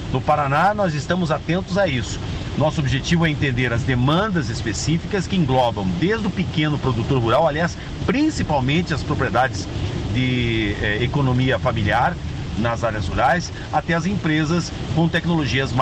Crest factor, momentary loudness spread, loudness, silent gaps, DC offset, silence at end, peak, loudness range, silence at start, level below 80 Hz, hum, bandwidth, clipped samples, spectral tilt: 14 dB; 6 LU; -20 LUFS; none; under 0.1%; 0 s; -6 dBFS; 1 LU; 0 s; -36 dBFS; none; 9 kHz; under 0.1%; -6 dB/octave